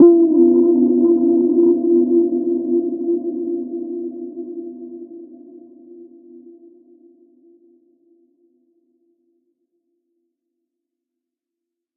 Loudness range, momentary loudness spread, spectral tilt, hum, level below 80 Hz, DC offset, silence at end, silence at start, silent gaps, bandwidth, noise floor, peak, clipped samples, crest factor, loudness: 23 LU; 21 LU; -14.5 dB/octave; none; -76 dBFS; under 0.1%; 5.95 s; 0 s; none; 1.4 kHz; -84 dBFS; -2 dBFS; under 0.1%; 18 dB; -16 LUFS